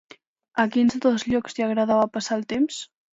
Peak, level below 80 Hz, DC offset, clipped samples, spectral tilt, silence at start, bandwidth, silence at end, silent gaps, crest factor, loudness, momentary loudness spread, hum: -8 dBFS; -60 dBFS; under 0.1%; under 0.1%; -4.5 dB/octave; 0.55 s; 8 kHz; 0.3 s; none; 16 dB; -23 LUFS; 6 LU; none